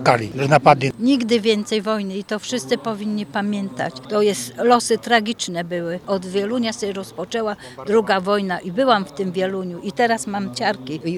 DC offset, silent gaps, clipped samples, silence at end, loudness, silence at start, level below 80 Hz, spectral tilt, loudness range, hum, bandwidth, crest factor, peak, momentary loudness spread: under 0.1%; none; under 0.1%; 0 s; -20 LUFS; 0 s; -60 dBFS; -4.5 dB/octave; 3 LU; none; 15 kHz; 20 dB; 0 dBFS; 9 LU